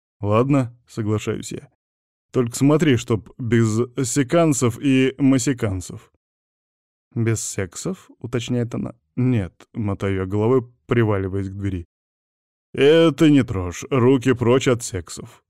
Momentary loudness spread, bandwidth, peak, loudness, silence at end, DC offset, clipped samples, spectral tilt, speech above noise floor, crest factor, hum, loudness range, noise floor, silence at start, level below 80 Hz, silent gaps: 14 LU; 14.5 kHz; -6 dBFS; -20 LUFS; 0.2 s; 0.1%; under 0.1%; -6 dB/octave; over 70 dB; 14 dB; none; 7 LU; under -90 dBFS; 0.2 s; -50 dBFS; 1.75-2.29 s, 6.16-7.11 s, 11.85-12.73 s